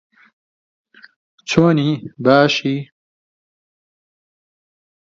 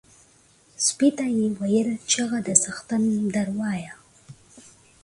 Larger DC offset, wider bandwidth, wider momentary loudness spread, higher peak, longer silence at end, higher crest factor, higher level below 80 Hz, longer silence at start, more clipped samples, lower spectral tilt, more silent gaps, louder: neither; second, 7.8 kHz vs 11.5 kHz; first, 11 LU vs 8 LU; about the same, 0 dBFS vs 0 dBFS; first, 2.25 s vs 0.45 s; about the same, 20 dB vs 24 dB; about the same, -58 dBFS vs -62 dBFS; first, 1.45 s vs 0.8 s; neither; first, -6 dB/octave vs -3.5 dB/octave; neither; first, -16 LUFS vs -23 LUFS